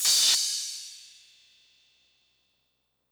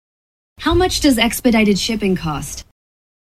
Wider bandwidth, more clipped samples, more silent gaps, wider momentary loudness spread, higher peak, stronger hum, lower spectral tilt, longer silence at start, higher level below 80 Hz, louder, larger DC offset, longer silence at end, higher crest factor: first, over 20 kHz vs 16 kHz; neither; neither; first, 24 LU vs 12 LU; second, -12 dBFS vs -2 dBFS; neither; second, 4.5 dB/octave vs -4 dB/octave; second, 0 s vs 0.6 s; second, -80 dBFS vs -34 dBFS; second, -23 LUFS vs -16 LUFS; neither; first, 2.1 s vs 0.65 s; about the same, 20 dB vs 16 dB